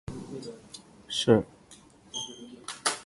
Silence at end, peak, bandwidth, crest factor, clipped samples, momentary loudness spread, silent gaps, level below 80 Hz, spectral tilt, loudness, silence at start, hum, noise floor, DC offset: 0 s; -6 dBFS; 11.5 kHz; 26 dB; under 0.1%; 22 LU; none; -58 dBFS; -4 dB/octave; -30 LUFS; 0.1 s; none; -55 dBFS; under 0.1%